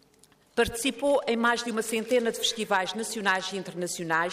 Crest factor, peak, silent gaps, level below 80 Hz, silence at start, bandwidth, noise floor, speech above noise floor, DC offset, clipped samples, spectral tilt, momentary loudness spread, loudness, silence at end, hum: 18 dB; -10 dBFS; none; -56 dBFS; 0.55 s; 15.5 kHz; -61 dBFS; 33 dB; under 0.1%; under 0.1%; -2.5 dB/octave; 8 LU; -27 LUFS; 0 s; none